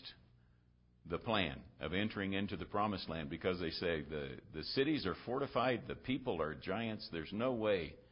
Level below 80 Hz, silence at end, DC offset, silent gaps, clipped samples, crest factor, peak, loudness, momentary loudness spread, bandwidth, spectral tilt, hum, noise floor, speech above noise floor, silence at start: -60 dBFS; 0.1 s; under 0.1%; none; under 0.1%; 20 dB; -20 dBFS; -39 LUFS; 8 LU; 5.4 kHz; -4 dB/octave; 60 Hz at -65 dBFS; -70 dBFS; 31 dB; 0 s